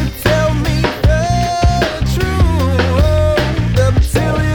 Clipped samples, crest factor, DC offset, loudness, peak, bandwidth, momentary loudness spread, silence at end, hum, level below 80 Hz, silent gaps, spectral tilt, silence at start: under 0.1%; 12 dB; under 0.1%; -14 LUFS; 0 dBFS; 19.5 kHz; 3 LU; 0 s; none; -18 dBFS; none; -6 dB/octave; 0 s